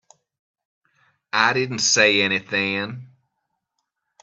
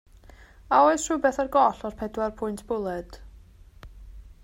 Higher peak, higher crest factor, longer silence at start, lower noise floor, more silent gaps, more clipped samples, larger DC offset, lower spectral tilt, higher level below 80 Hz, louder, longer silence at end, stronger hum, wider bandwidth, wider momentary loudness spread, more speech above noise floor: first, -2 dBFS vs -6 dBFS; about the same, 24 dB vs 20 dB; first, 1.35 s vs 0.7 s; first, -78 dBFS vs -50 dBFS; neither; neither; neither; second, -2 dB/octave vs -4.5 dB/octave; second, -68 dBFS vs -48 dBFS; first, -19 LUFS vs -25 LUFS; first, 1.15 s vs 0.15 s; neither; second, 8.4 kHz vs 16 kHz; about the same, 12 LU vs 14 LU; first, 58 dB vs 26 dB